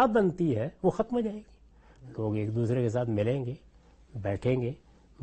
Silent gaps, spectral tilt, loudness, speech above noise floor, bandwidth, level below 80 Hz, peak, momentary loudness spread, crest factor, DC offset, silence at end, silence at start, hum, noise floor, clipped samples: none; -8.5 dB/octave; -30 LUFS; 27 dB; 8.4 kHz; -56 dBFS; -12 dBFS; 16 LU; 18 dB; under 0.1%; 0 s; 0 s; none; -56 dBFS; under 0.1%